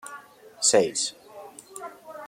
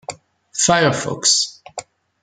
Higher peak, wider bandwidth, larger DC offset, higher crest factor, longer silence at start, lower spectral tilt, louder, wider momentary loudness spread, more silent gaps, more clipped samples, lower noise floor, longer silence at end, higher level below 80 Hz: second, -6 dBFS vs -2 dBFS; first, 16.5 kHz vs 12 kHz; neither; about the same, 22 dB vs 20 dB; about the same, 0.05 s vs 0.1 s; about the same, -1.5 dB/octave vs -2 dB/octave; second, -23 LUFS vs -16 LUFS; first, 24 LU vs 20 LU; neither; neither; first, -46 dBFS vs -37 dBFS; second, 0 s vs 0.4 s; second, -74 dBFS vs -56 dBFS